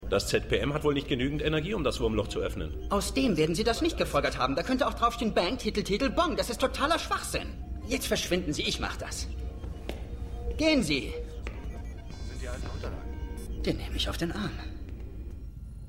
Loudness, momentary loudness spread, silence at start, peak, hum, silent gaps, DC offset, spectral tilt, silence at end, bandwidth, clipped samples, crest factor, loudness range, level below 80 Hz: -30 LUFS; 14 LU; 0 s; -12 dBFS; none; none; under 0.1%; -4.5 dB/octave; 0 s; 16 kHz; under 0.1%; 18 dB; 7 LU; -38 dBFS